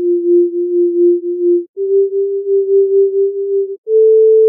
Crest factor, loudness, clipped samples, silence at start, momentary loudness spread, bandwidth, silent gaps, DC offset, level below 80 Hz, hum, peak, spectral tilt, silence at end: 8 dB; -13 LUFS; under 0.1%; 0 s; 6 LU; 0.6 kHz; 1.69-1.74 s, 3.78-3.84 s; under 0.1%; -90 dBFS; none; -4 dBFS; -4.5 dB/octave; 0 s